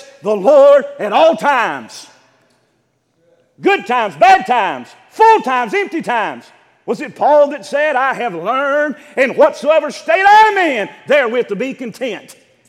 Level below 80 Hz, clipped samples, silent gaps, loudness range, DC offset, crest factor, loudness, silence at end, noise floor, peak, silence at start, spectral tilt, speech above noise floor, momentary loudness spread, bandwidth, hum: -64 dBFS; under 0.1%; none; 4 LU; under 0.1%; 14 dB; -13 LUFS; 0.35 s; -62 dBFS; 0 dBFS; 0.25 s; -4 dB/octave; 49 dB; 15 LU; 13 kHz; none